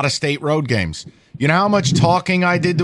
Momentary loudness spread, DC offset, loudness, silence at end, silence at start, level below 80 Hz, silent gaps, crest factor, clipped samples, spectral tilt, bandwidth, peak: 6 LU; under 0.1%; -17 LUFS; 0 s; 0 s; -46 dBFS; none; 14 dB; under 0.1%; -5.5 dB/octave; 11.5 kHz; -2 dBFS